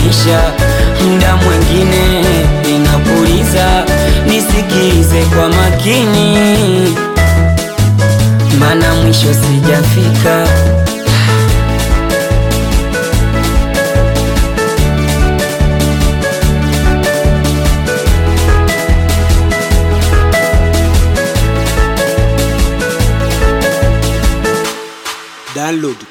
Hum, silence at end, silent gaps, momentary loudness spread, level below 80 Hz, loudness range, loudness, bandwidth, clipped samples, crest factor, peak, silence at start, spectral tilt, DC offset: none; 0.05 s; none; 4 LU; -14 dBFS; 3 LU; -11 LUFS; 17.5 kHz; under 0.1%; 10 dB; 0 dBFS; 0 s; -5.5 dB/octave; under 0.1%